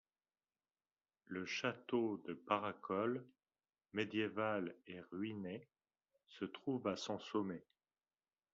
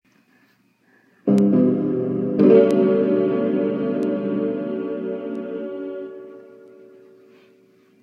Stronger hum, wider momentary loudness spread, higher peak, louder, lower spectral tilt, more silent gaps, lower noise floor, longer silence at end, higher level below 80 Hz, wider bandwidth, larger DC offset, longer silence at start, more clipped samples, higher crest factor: neither; second, 10 LU vs 16 LU; second, -20 dBFS vs -2 dBFS; second, -43 LUFS vs -20 LUFS; second, -4 dB/octave vs -9.5 dB/octave; neither; first, under -90 dBFS vs -60 dBFS; second, 0.95 s vs 1.6 s; second, -86 dBFS vs -66 dBFS; second, 7.2 kHz vs 8.6 kHz; neither; about the same, 1.3 s vs 1.25 s; neither; first, 24 dB vs 18 dB